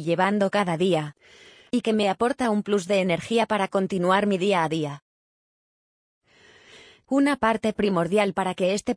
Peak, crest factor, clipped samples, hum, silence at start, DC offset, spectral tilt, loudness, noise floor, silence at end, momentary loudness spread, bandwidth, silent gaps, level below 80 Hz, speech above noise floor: -8 dBFS; 16 dB; under 0.1%; none; 0 s; under 0.1%; -5.5 dB/octave; -23 LUFS; -54 dBFS; 0 s; 5 LU; 10.5 kHz; 5.02-6.21 s; -60 dBFS; 31 dB